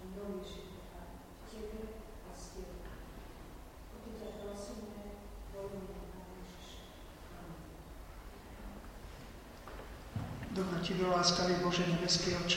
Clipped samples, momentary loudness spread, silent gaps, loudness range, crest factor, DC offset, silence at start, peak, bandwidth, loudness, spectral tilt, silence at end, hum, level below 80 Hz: under 0.1%; 21 LU; none; 16 LU; 24 dB; under 0.1%; 0 s; -16 dBFS; 16 kHz; -37 LUFS; -4 dB/octave; 0 s; none; -52 dBFS